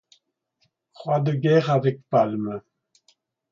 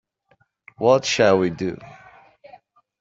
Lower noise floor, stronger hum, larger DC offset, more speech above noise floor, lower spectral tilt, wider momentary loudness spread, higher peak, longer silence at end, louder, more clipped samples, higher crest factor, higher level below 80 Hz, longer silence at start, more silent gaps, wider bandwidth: first, -71 dBFS vs -63 dBFS; neither; neither; first, 49 dB vs 45 dB; first, -8.5 dB/octave vs -4.5 dB/octave; about the same, 14 LU vs 12 LU; about the same, -6 dBFS vs -4 dBFS; second, 0.9 s vs 1.05 s; second, -22 LUFS vs -19 LUFS; neither; about the same, 18 dB vs 20 dB; second, -68 dBFS vs -60 dBFS; first, 1 s vs 0.8 s; neither; about the same, 7.2 kHz vs 7.8 kHz